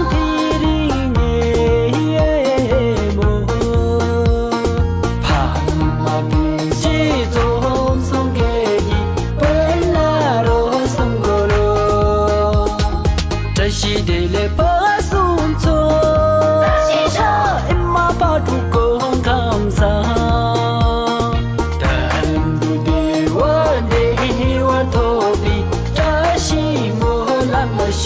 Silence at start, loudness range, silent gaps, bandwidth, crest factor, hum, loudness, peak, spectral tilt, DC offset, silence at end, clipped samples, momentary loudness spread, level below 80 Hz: 0 s; 2 LU; none; 8 kHz; 10 dB; none; -16 LUFS; -4 dBFS; -6 dB/octave; under 0.1%; 0 s; under 0.1%; 3 LU; -22 dBFS